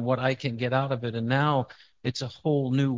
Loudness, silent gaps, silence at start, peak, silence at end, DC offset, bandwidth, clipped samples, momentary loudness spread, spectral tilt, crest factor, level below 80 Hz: -27 LUFS; none; 0 s; -8 dBFS; 0 s; under 0.1%; 7.6 kHz; under 0.1%; 8 LU; -7 dB/octave; 18 dB; -62 dBFS